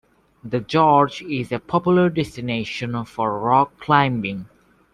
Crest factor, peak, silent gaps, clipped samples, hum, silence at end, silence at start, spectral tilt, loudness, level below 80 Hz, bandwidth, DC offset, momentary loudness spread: 18 dB; -2 dBFS; none; under 0.1%; none; 0.5 s; 0.45 s; -7 dB/octave; -20 LUFS; -54 dBFS; 11.5 kHz; under 0.1%; 11 LU